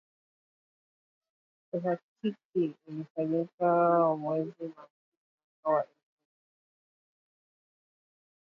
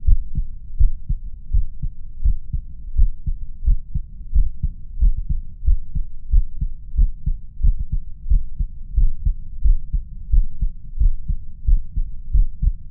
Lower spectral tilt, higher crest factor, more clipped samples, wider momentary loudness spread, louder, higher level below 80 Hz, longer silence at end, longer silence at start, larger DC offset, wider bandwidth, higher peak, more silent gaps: second, -10 dB/octave vs -16.5 dB/octave; about the same, 18 dB vs 16 dB; neither; first, 15 LU vs 8 LU; second, -31 LUFS vs -26 LUFS; second, -86 dBFS vs -18 dBFS; first, 2.6 s vs 0 s; first, 1.75 s vs 0 s; neither; first, 5.6 kHz vs 0.3 kHz; second, -14 dBFS vs -2 dBFS; first, 2.03-2.16 s, 2.45-2.53 s, 3.10-3.15 s, 3.54-3.58 s, 4.90-5.38 s, 5.44-5.63 s vs none